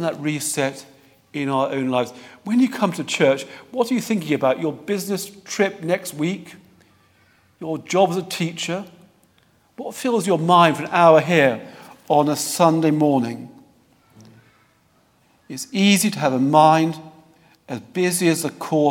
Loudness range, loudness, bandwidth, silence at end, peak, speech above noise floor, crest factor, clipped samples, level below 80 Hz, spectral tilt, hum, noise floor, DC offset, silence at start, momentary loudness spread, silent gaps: 8 LU; -20 LUFS; 19 kHz; 0 s; 0 dBFS; 40 dB; 20 dB; under 0.1%; -70 dBFS; -5 dB/octave; none; -60 dBFS; under 0.1%; 0 s; 17 LU; none